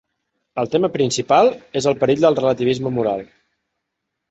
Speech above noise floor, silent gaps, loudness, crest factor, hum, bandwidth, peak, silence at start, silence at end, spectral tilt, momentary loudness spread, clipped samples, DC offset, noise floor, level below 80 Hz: 61 dB; none; -18 LUFS; 18 dB; none; 8.4 kHz; -2 dBFS; 0.55 s; 1.05 s; -5 dB/octave; 8 LU; under 0.1%; under 0.1%; -78 dBFS; -56 dBFS